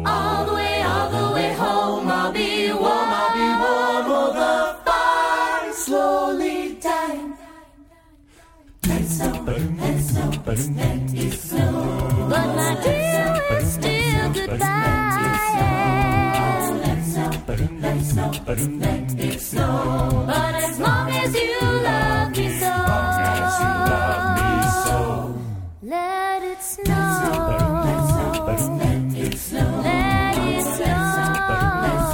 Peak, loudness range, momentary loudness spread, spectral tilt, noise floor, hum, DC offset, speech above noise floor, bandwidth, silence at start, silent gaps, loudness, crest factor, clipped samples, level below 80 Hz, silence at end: -6 dBFS; 4 LU; 5 LU; -5 dB/octave; -51 dBFS; none; under 0.1%; 30 dB; 17.5 kHz; 0 s; none; -21 LUFS; 16 dB; under 0.1%; -34 dBFS; 0 s